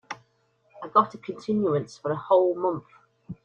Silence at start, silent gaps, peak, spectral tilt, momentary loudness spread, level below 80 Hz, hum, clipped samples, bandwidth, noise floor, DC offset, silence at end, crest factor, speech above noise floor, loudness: 0.1 s; none; -6 dBFS; -7.5 dB/octave; 20 LU; -68 dBFS; none; under 0.1%; 8.6 kHz; -67 dBFS; under 0.1%; 0.1 s; 20 dB; 43 dB; -25 LUFS